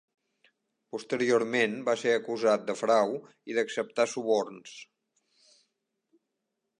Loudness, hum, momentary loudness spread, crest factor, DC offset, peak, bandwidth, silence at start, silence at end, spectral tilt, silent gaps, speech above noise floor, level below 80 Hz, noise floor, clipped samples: -28 LUFS; none; 15 LU; 20 dB; under 0.1%; -12 dBFS; 11 kHz; 0.95 s; 1.95 s; -4 dB/octave; none; 55 dB; -84 dBFS; -83 dBFS; under 0.1%